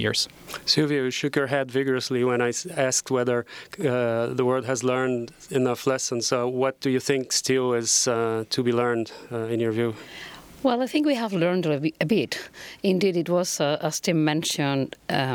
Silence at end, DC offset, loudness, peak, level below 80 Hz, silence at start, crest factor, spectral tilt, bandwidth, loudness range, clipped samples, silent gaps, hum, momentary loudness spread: 0 s; under 0.1%; -24 LUFS; -6 dBFS; -64 dBFS; 0 s; 18 dB; -4 dB/octave; 19 kHz; 2 LU; under 0.1%; none; none; 7 LU